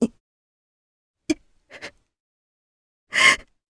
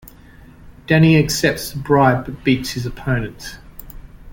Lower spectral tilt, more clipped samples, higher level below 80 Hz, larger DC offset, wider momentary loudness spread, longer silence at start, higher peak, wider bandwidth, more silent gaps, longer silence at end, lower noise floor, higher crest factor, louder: second, -1.5 dB/octave vs -5.5 dB/octave; neither; second, -58 dBFS vs -38 dBFS; neither; first, 25 LU vs 21 LU; second, 0 s vs 0.65 s; about the same, -2 dBFS vs -2 dBFS; second, 11 kHz vs 17 kHz; first, 0.20-1.14 s, 2.20-3.07 s vs none; first, 0.35 s vs 0 s; first, -47 dBFS vs -43 dBFS; first, 24 dB vs 18 dB; second, -20 LUFS vs -17 LUFS